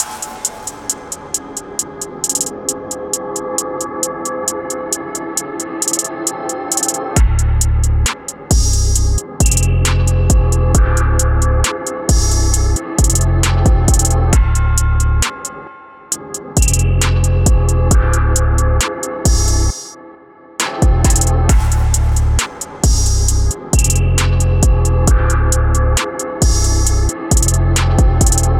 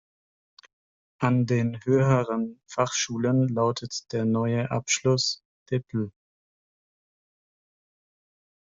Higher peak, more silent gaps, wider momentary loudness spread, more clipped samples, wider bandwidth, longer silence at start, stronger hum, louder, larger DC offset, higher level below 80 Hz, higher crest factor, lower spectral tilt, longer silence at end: first, 0 dBFS vs -8 dBFS; second, none vs 5.45-5.66 s; about the same, 9 LU vs 9 LU; neither; first, 16.5 kHz vs 7.8 kHz; second, 0 s vs 1.2 s; neither; first, -15 LUFS vs -26 LUFS; neither; first, -16 dBFS vs -62 dBFS; second, 12 dB vs 20 dB; about the same, -4.5 dB/octave vs -5 dB/octave; second, 0 s vs 2.65 s